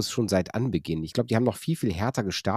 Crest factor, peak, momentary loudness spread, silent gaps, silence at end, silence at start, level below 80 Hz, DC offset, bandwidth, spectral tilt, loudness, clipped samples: 18 dB; -8 dBFS; 3 LU; none; 0 s; 0 s; -52 dBFS; under 0.1%; 16 kHz; -5.5 dB/octave; -27 LUFS; under 0.1%